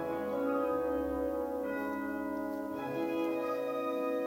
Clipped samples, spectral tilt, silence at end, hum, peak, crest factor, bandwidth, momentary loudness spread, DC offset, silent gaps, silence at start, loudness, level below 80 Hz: under 0.1%; -6.5 dB/octave; 0 s; none; -22 dBFS; 14 dB; 16 kHz; 5 LU; under 0.1%; none; 0 s; -35 LUFS; -60 dBFS